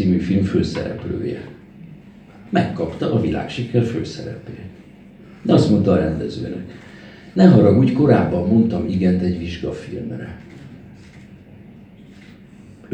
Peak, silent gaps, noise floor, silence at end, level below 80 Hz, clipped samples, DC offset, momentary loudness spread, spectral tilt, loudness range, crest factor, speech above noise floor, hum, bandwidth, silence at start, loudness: 0 dBFS; none; -43 dBFS; 0 s; -44 dBFS; under 0.1%; under 0.1%; 23 LU; -8.5 dB/octave; 9 LU; 20 dB; 25 dB; none; 8.6 kHz; 0 s; -18 LUFS